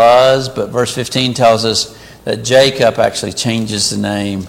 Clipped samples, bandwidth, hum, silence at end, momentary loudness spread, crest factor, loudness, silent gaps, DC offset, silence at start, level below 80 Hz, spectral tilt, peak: under 0.1%; 16.5 kHz; none; 0 s; 9 LU; 12 dB; -13 LUFS; none; under 0.1%; 0 s; -46 dBFS; -4 dB/octave; 0 dBFS